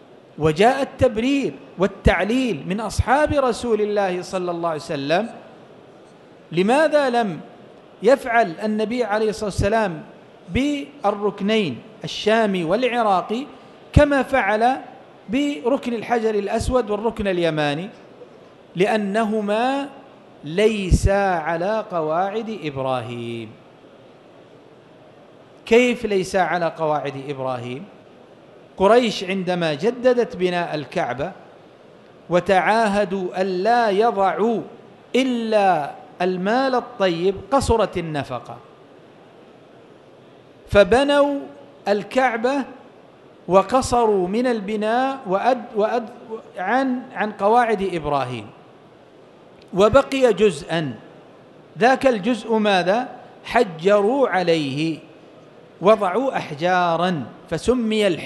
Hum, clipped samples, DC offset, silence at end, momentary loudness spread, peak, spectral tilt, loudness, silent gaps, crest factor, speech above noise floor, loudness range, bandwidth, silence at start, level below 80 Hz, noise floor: none; under 0.1%; under 0.1%; 0 s; 12 LU; 0 dBFS; -5.5 dB/octave; -20 LUFS; none; 20 dB; 28 dB; 4 LU; 12.5 kHz; 0.35 s; -38 dBFS; -47 dBFS